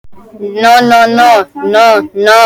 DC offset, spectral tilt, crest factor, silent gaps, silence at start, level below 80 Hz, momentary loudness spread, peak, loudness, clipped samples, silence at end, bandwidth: under 0.1%; -3 dB/octave; 8 dB; none; 0.05 s; -50 dBFS; 7 LU; 0 dBFS; -7 LUFS; 0.8%; 0 s; 20 kHz